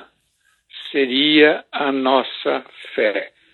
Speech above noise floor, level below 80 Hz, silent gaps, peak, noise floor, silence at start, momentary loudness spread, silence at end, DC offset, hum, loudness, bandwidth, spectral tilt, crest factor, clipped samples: 46 dB; -78 dBFS; none; 0 dBFS; -63 dBFS; 0 s; 14 LU; 0.25 s; under 0.1%; none; -18 LUFS; 4.5 kHz; -5.5 dB/octave; 20 dB; under 0.1%